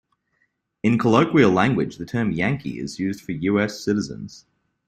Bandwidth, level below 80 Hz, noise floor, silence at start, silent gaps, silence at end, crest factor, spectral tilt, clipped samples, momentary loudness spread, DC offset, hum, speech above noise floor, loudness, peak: 14 kHz; -54 dBFS; -70 dBFS; 0.85 s; none; 0.5 s; 20 dB; -6.5 dB/octave; under 0.1%; 12 LU; under 0.1%; none; 49 dB; -21 LUFS; -2 dBFS